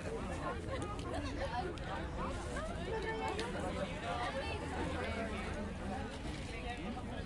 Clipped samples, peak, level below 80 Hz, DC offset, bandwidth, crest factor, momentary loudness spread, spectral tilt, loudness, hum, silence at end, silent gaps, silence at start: under 0.1%; -24 dBFS; -48 dBFS; under 0.1%; 11.5 kHz; 16 dB; 4 LU; -5.5 dB/octave; -41 LUFS; none; 0 s; none; 0 s